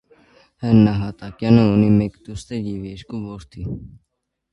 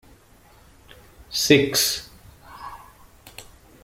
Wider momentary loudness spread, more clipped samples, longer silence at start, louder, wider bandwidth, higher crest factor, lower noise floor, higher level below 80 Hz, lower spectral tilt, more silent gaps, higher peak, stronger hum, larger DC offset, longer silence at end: second, 17 LU vs 27 LU; neither; second, 0.6 s vs 1.3 s; about the same, -18 LUFS vs -20 LUFS; second, 10 kHz vs 16.5 kHz; about the same, 20 dB vs 24 dB; about the same, -53 dBFS vs -53 dBFS; first, -44 dBFS vs -54 dBFS; first, -8.5 dB/octave vs -3 dB/octave; neither; about the same, 0 dBFS vs -2 dBFS; neither; neither; first, 0.65 s vs 0.4 s